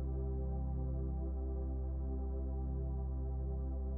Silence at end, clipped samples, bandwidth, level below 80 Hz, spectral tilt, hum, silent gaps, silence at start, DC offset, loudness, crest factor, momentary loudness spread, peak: 0 s; under 0.1%; 1.6 kHz; -38 dBFS; -12.5 dB/octave; none; none; 0 s; under 0.1%; -41 LUFS; 10 dB; 1 LU; -28 dBFS